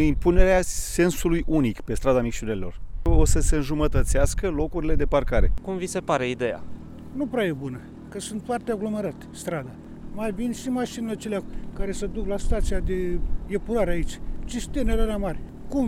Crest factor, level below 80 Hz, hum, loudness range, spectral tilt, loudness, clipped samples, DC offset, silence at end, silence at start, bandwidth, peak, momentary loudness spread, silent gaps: 20 dB; -28 dBFS; none; 6 LU; -5.5 dB/octave; -26 LUFS; under 0.1%; under 0.1%; 0 s; 0 s; 15 kHz; -2 dBFS; 13 LU; none